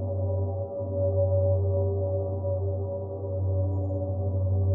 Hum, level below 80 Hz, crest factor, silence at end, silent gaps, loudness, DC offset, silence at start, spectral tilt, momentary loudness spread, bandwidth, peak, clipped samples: none; -62 dBFS; 12 dB; 0 s; none; -28 LUFS; under 0.1%; 0 s; -16 dB/octave; 7 LU; 1.3 kHz; -16 dBFS; under 0.1%